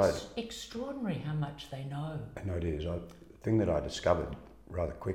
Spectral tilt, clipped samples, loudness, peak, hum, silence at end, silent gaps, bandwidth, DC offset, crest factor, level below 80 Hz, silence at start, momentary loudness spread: -6.5 dB/octave; under 0.1%; -35 LUFS; -12 dBFS; none; 0 s; none; 16.5 kHz; under 0.1%; 22 dB; -48 dBFS; 0 s; 11 LU